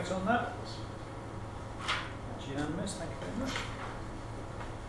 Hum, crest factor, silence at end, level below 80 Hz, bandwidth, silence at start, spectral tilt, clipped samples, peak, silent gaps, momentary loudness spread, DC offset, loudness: none; 20 dB; 0 s; -50 dBFS; 12 kHz; 0 s; -5 dB/octave; under 0.1%; -18 dBFS; none; 11 LU; under 0.1%; -38 LUFS